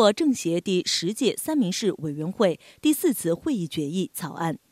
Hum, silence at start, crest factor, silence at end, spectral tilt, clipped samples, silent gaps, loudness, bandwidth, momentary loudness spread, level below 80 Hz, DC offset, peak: none; 0 s; 18 dB; 0.15 s; -4.5 dB/octave; under 0.1%; none; -25 LUFS; 16 kHz; 7 LU; -66 dBFS; under 0.1%; -6 dBFS